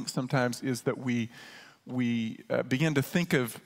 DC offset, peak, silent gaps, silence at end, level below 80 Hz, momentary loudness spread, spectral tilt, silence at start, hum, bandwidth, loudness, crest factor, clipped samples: under 0.1%; -10 dBFS; none; 0.05 s; -70 dBFS; 11 LU; -5.5 dB/octave; 0 s; none; 16 kHz; -30 LUFS; 20 dB; under 0.1%